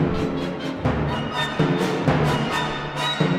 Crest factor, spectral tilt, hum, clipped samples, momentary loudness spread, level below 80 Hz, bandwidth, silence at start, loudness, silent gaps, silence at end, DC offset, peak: 16 dB; -6 dB/octave; none; under 0.1%; 5 LU; -40 dBFS; 14.5 kHz; 0 s; -23 LUFS; none; 0 s; under 0.1%; -6 dBFS